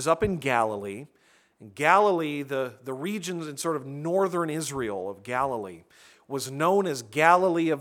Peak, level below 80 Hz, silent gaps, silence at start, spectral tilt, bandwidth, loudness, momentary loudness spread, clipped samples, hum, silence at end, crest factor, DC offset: -4 dBFS; -58 dBFS; none; 0 s; -5 dB/octave; 17.5 kHz; -26 LUFS; 14 LU; under 0.1%; none; 0 s; 22 dB; under 0.1%